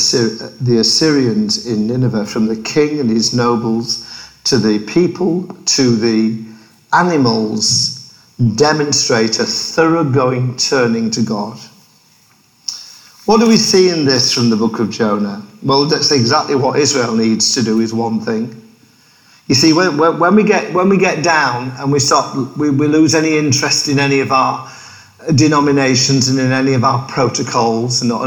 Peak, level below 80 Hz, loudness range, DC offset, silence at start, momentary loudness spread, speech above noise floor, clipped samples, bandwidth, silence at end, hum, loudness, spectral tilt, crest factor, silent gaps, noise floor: 0 dBFS; -52 dBFS; 3 LU; under 0.1%; 0 s; 8 LU; 38 dB; under 0.1%; 19 kHz; 0 s; none; -13 LUFS; -4 dB/octave; 14 dB; none; -51 dBFS